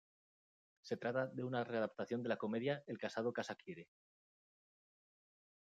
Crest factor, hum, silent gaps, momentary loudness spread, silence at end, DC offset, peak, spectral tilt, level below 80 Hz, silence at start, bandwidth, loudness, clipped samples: 20 dB; none; none; 10 LU; 1.8 s; under 0.1%; -24 dBFS; -6.5 dB/octave; under -90 dBFS; 0.85 s; 9 kHz; -42 LUFS; under 0.1%